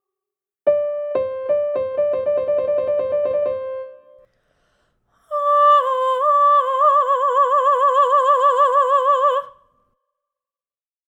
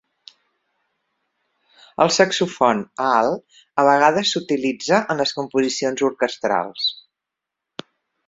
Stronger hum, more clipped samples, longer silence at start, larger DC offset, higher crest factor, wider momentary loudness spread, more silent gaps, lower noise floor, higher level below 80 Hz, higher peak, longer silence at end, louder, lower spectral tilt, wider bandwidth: neither; neither; second, 0.65 s vs 2 s; neither; second, 14 dB vs 20 dB; second, 9 LU vs 16 LU; neither; first, under -90 dBFS vs -84 dBFS; about the same, -66 dBFS vs -64 dBFS; about the same, -4 dBFS vs -2 dBFS; first, 1.6 s vs 1.35 s; about the same, -17 LUFS vs -19 LUFS; about the same, -3.5 dB/octave vs -3.5 dB/octave; first, 9.2 kHz vs 8 kHz